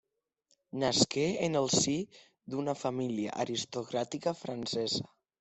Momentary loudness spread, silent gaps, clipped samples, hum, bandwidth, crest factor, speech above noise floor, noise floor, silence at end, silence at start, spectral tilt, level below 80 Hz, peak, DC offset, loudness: 10 LU; none; under 0.1%; none; 8.4 kHz; 22 dB; 44 dB; -77 dBFS; 0.35 s; 0.75 s; -3.5 dB/octave; -70 dBFS; -10 dBFS; under 0.1%; -32 LUFS